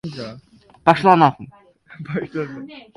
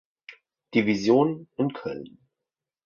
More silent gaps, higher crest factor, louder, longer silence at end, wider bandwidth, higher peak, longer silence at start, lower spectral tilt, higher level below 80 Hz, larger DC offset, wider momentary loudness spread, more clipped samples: neither; about the same, 20 dB vs 20 dB; first, -17 LUFS vs -25 LUFS; second, 0.15 s vs 0.8 s; first, 11.5 kHz vs 7.2 kHz; first, 0 dBFS vs -8 dBFS; second, 0.05 s vs 0.3 s; about the same, -7 dB/octave vs -6.5 dB/octave; first, -58 dBFS vs -66 dBFS; neither; first, 22 LU vs 14 LU; neither